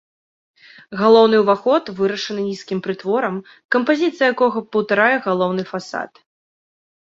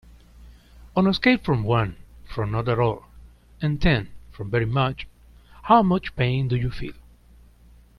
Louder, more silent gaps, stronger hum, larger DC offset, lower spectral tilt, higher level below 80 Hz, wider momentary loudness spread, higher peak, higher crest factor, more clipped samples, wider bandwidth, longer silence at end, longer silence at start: first, -18 LUFS vs -23 LUFS; first, 3.65-3.69 s vs none; neither; neither; second, -5.5 dB/octave vs -8 dB/octave; second, -64 dBFS vs -40 dBFS; second, 13 LU vs 18 LU; about the same, -2 dBFS vs -4 dBFS; about the same, 18 dB vs 20 dB; neither; second, 7.6 kHz vs 11 kHz; about the same, 1.1 s vs 1 s; first, 0.9 s vs 0.4 s